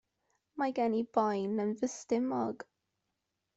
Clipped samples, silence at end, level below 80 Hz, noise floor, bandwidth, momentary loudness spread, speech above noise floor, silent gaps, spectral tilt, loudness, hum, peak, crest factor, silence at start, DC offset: under 0.1%; 0.95 s; -78 dBFS; -85 dBFS; 8.2 kHz; 13 LU; 52 dB; none; -5.5 dB/octave; -33 LUFS; none; -16 dBFS; 20 dB; 0.55 s; under 0.1%